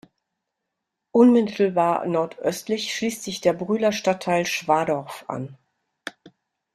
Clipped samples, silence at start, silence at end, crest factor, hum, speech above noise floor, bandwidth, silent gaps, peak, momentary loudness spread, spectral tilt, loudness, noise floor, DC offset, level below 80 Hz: under 0.1%; 1.15 s; 0.45 s; 20 dB; none; 60 dB; 14 kHz; none; -4 dBFS; 16 LU; -5 dB/octave; -22 LUFS; -82 dBFS; under 0.1%; -66 dBFS